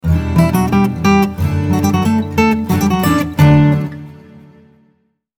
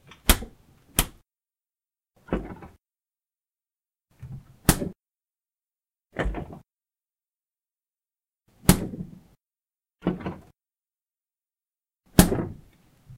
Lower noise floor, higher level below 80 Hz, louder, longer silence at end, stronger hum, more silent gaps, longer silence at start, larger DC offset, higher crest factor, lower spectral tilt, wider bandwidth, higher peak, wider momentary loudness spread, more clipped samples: second, -60 dBFS vs under -90 dBFS; first, -32 dBFS vs -38 dBFS; first, -13 LUFS vs -26 LUFS; first, 1.25 s vs 0.05 s; neither; neither; second, 0.05 s vs 0.25 s; neither; second, 14 dB vs 30 dB; first, -7 dB/octave vs -4.5 dB/octave; first, 19 kHz vs 16 kHz; about the same, 0 dBFS vs 0 dBFS; second, 6 LU vs 22 LU; neither